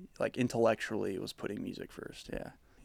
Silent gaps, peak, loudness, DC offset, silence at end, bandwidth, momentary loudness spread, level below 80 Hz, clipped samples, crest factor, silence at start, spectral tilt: none; -16 dBFS; -36 LUFS; under 0.1%; 0 s; 16.5 kHz; 15 LU; -60 dBFS; under 0.1%; 20 dB; 0 s; -5.5 dB/octave